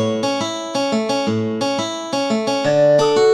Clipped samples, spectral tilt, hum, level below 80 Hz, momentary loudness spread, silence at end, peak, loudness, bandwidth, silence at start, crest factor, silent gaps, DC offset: under 0.1%; -4.5 dB/octave; none; -60 dBFS; 8 LU; 0 s; -4 dBFS; -18 LUFS; 12.5 kHz; 0 s; 14 dB; none; under 0.1%